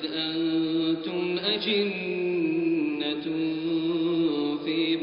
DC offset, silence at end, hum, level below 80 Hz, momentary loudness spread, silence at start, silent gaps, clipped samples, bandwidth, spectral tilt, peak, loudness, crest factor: under 0.1%; 0 s; none; -68 dBFS; 3 LU; 0 s; none; under 0.1%; 5.2 kHz; -3.5 dB/octave; -12 dBFS; -27 LUFS; 14 dB